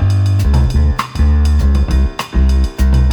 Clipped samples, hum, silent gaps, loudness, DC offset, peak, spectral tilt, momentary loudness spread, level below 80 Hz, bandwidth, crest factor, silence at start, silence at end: under 0.1%; none; none; -14 LUFS; under 0.1%; 0 dBFS; -7 dB/octave; 3 LU; -12 dBFS; 11 kHz; 10 dB; 0 s; 0 s